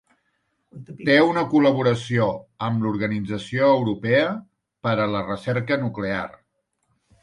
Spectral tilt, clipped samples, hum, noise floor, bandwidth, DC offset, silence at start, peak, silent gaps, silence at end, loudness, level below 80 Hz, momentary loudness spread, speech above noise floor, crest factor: -7 dB/octave; under 0.1%; none; -72 dBFS; 11 kHz; under 0.1%; 0.75 s; -4 dBFS; none; 0.95 s; -22 LUFS; -56 dBFS; 11 LU; 51 dB; 20 dB